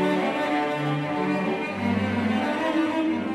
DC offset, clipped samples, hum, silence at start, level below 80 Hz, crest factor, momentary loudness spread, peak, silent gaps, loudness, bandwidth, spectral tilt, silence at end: under 0.1%; under 0.1%; none; 0 s; -66 dBFS; 12 dB; 2 LU; -12 dBFS; none; -25 LUFS; 13 kHz; -6.5 dB/octave; 0 s